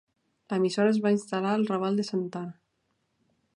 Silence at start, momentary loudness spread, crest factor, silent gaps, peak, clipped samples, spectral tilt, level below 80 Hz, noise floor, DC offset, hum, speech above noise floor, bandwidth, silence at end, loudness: 0.5 s; 11 LU; 16 dB; none; -12 dBFS; under 0.1%; -6.5 dB/octave; -78 dBFS; -76 dBFS; under 0.1%; none; 49 dB; 11 kHz; 1.05 s; -27 LUFS